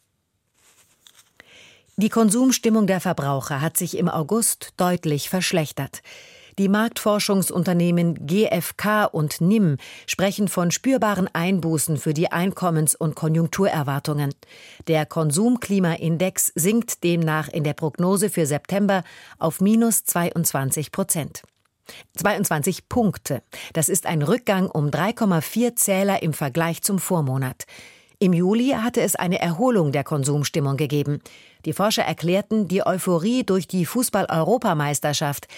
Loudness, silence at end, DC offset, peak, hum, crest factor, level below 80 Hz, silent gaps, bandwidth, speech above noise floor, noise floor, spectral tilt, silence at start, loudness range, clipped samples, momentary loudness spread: -21 LUFS; 0 s; under 0.1%; -6 dBFS; none; 16 dB; -60 dBFS; none; 17 kHz; 50 dB; -72 dBFS; -5 dB/octave; 2 s; 2 LU; under 0.1%; 6 LU